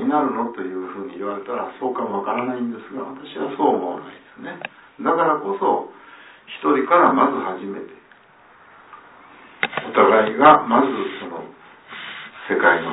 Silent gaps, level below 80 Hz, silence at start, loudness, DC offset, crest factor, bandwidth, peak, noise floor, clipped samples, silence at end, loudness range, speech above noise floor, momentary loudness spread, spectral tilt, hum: none; -64 dBFS; 0 s; -19 LUFS; under 0.1%; 20 dB; 4 kHz; -2 dBFS; -50 dBFS; under 0.1%; 0 s; 7 LU; 31 dB; 20 LU; -9 dB/octave; none